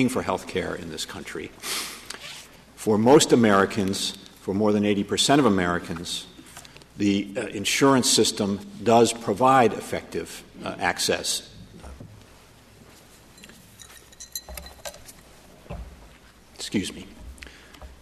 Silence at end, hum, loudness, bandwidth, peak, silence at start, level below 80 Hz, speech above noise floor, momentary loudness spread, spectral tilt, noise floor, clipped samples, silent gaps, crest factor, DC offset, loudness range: 0.15 s; none; -23 LUFS; 13.5 kHz; -6 dBFS; 0 s; -52 dBFS; 29 dB; 24 LU; -4 dB/octave; -51 dBFS; under 0.1%; none; 20 dB; under 0.1%; 20 LU